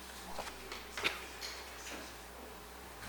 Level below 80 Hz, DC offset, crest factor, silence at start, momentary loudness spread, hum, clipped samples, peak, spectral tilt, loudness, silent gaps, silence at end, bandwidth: -58 dBFS; under 0.1%; 26 dB; 0 s; 12 LU; none; under 0.1%; -20 dBFS; -2 dB/octave; -43 LUFS; none; 0 s; 19 kHz